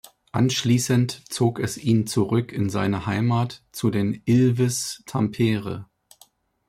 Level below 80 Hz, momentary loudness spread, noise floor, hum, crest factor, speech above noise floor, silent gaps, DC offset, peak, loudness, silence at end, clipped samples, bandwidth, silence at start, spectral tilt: -58 dBFS; 8 LU; -57 dBFS; none; 14 dB; 35 dB; none; under 0.1%; -8 dBFS; -23 LUFS; 0.85 s; under 0.1%; 15.5 kHz; 0.35 s; -5.5 dB/octave